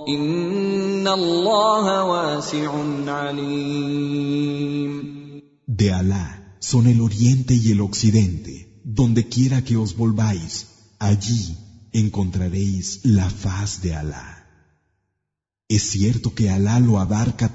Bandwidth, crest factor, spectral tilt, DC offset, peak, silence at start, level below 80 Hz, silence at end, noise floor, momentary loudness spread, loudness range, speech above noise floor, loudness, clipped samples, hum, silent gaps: 8 kHz; 16 dB; -6 dB/octave; under 0.1%; -4 dBFS; 0 s; -42 dBFS; 0 s; -82 dBFS; 12 LU; 5 LU; 63 dB; -20 LUFS; under 0.1%; none; none